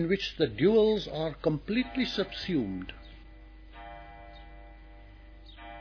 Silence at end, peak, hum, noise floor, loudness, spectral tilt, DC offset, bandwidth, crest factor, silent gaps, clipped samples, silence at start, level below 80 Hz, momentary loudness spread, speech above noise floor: 0 s; -14 dBFS; none; -50 dBFS; -29 LUFS; -6.5 dB/octave; under 0.1%; 5.4 kHz; 18 dB; none; under 0.1%; 0 s; -50 dBFS; 26 LU; 21 dB